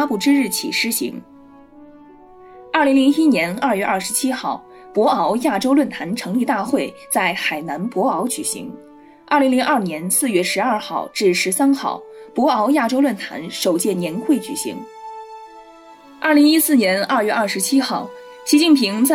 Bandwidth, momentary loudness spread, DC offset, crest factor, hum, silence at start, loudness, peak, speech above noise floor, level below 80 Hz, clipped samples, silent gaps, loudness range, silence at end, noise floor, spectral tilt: 17 kHz; 13 LU; under 0.1%; 16 dB; none; 0 s; -18 LUFS; -4 dBFS; 26 dB; -64 dBFS; under 0.1%; none; 3 LU; 0 s; -44 dBFS; -3.5 dB/octave